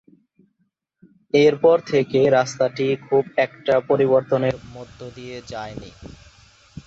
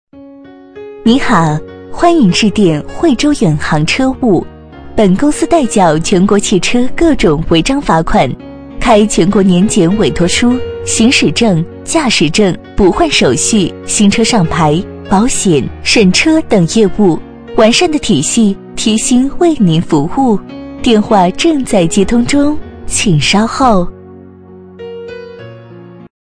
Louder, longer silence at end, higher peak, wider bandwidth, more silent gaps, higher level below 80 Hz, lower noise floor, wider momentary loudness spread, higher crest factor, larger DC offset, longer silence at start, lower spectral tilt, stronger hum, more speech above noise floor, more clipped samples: second, -19 LUFS vs -10 LUFS; second, 0.05 s vs 0.2 s; second, -4 dBFS vs 0 dBFS; second, 8 kHz vs 10.5 kHz; neither; second, -54 dBFS vs -28 dBFS; first, -71 dBFS vs -35 dBFS; first, 20 LU vs 8 LU; first, 16 dB vs 10 dB; neither; first, 1.35 s vs 0.15 s; first, -6 dB/octave vs -4.5 dB/octave; neither; first, 51 dB vs 25 dB; second, under 0.1% vs 0.1%